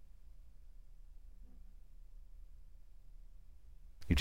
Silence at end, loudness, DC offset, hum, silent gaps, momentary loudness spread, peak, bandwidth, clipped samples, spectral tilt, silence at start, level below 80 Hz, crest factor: 0 s; -47 LUFS; 0.2%; none; none; 3 LU; -16 dBFS; 15 kHz; under 0.1%; -5.5 dB/octave; 0 s; -50 dBFS; 28 dB